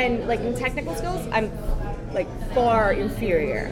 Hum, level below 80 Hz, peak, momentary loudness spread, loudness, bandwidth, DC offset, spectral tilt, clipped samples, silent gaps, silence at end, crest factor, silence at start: none; -32 dBFS; -6 dBFS; 9 LU; -24 LUFS; 16.5 kHz; under 0.1%; -6 dB/octave; under 0.1%; none; 0 s; 16 dB; 0 s